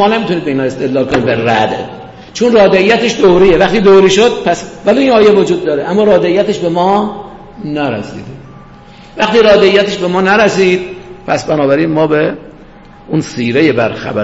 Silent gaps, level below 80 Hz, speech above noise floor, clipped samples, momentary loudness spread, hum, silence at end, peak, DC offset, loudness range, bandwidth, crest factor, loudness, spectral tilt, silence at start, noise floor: none; -38 dBFS; 26 dB; under 0.1%; 15 LU; none; 0 s; 0 dBFS; under 0.1%; 5 LU; 8 kHz; 10 dB; -10 LUFS; -5.5 dB/octave; 0 s; -36 dBFS